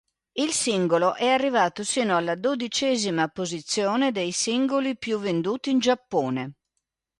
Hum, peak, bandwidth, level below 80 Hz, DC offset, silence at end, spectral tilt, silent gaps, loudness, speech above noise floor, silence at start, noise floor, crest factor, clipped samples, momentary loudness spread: none; -8 dBFS; 11.5 kHz; -68 dBFS; under 0.1%; 0.7 s; -3.5 dB/octave; none; -24 LUFS; 56 dB; 0.35 s; -80 dBFS; 16 dB; under 0.1%; 6 LU